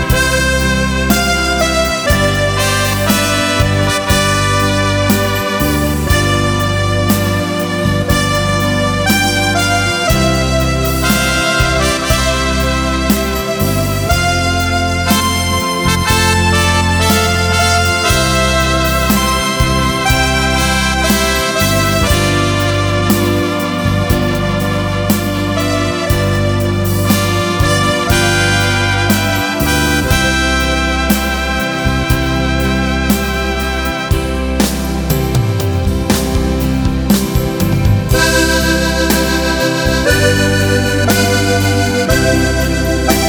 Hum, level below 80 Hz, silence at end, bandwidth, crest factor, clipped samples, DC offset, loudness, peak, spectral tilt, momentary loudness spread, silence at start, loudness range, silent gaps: none; -22 dBFS; 0 s; over 20 kHz; 12 dB; under 0.1%; under 0.1%; -13 LUFS; 0 dBFS; -4.5 dB/octave; 4 LU; 0 s; 3 LU; none